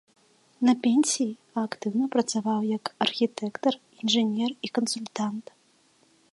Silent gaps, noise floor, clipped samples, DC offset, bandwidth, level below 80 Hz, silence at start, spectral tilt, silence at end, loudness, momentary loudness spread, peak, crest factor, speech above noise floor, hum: none; -63 dBFS; under 0.1%; under 0.1%; 11.5 kHz; -80 dBFS; 0.6 s; -3.5 dB/octave; 0.9 s; -27 LUFS; 9 LU; -8 dBFS; 20 dB; 37 dB; none